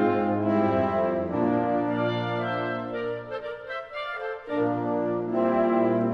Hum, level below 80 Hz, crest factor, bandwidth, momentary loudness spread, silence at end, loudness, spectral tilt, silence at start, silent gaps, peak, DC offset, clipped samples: none; -62 dBFS; 14 dB; 6.2 kHz; 10 LU; 0 s; -26 LUFS; -9 dB/octave; 0 s; none; -12 dBFS; under 0.1%; under 0.1%